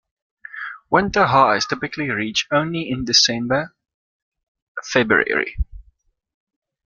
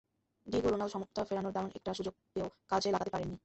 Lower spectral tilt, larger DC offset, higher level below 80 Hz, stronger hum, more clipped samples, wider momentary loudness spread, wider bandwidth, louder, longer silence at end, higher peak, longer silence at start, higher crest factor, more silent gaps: second, -3.5 dB/octave vs -5.5 dB/octave; neither; first, -40 dBFS vs -60 dBFS; neither; neither; first, 17 LU vs 8 LU; first, 12 kHz vs 8.2 kHz; first, -18 LUFS vs -36 LUFS; first, 1.05 s vs 0.05 s; first, 0 dBFS vs -18 dBFS; about the same, 0.55 s vs 0.45 s; about the same, 22 dB vs 18 dB; first, 3.94-4.32 s, 4.43-4.55 s, 4.62-4.75 s vs none